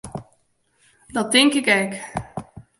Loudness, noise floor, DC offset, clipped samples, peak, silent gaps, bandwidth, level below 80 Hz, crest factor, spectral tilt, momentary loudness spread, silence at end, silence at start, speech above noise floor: -19 LUFS; -65 dBFS; under 0.1%; under 0.1%; 0 dBFS; none; 11.5 kHz; -54 dBFS; 22 dB; -3 dB/octave; 21 LU; 0.2 s; 0.05 s; 45 dB